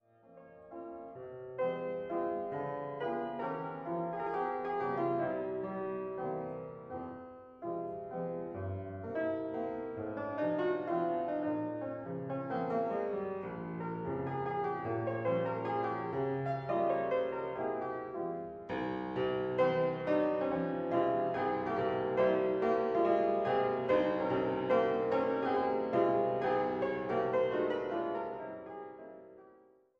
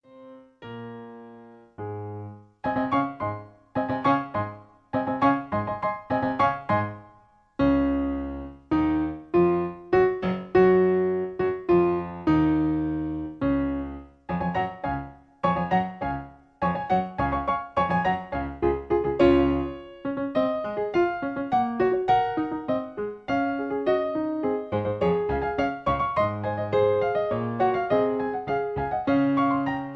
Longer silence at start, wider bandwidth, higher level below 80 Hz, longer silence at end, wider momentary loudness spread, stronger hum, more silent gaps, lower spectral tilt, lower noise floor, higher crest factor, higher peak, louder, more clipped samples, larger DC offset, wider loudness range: first, 0.3 s vs 0.15 s; about the same, 6.4 kHz vs 6.2 kHz; second, -68 dBFS vs -46 dBFS; first, 0.5 s vs 0 s; about the same, 11 LU vs 13 LU; neither; neither; about the same, -8.5 dB/octave vs -9 dB/octave; first, -63 dBFS vs -57 dBFS; about the same, 18 dB vs 18 dB; second, -18 dBFS vs -8 dBFS; second, -35 LUFS vs -25 LUFS; neither; neither; first, 8 LU vs 5 LU